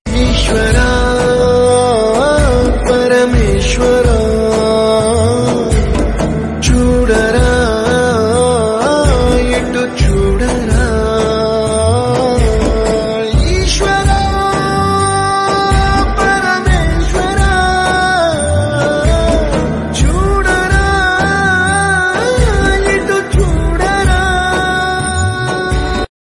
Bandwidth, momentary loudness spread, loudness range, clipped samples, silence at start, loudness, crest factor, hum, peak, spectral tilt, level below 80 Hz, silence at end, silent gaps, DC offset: 11.5 kHz; 4 LU; 2 LU; under 0.1%; 0.05 s; -12 LUFS; 10 dB; none; 0 dBFS; -5 dB/octave; -18 dBFS; 0.15 s; none; under 0.1%